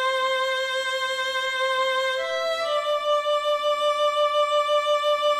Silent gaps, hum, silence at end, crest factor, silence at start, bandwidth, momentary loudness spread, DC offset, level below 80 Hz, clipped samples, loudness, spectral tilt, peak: none; none; 0 s; 12 dB; 0 s; 14 kHz; 3 LU; under 0.1%; -70 dBFS; under 0.1%; -23 LUFS; 1 dB/octave; -12 dBFS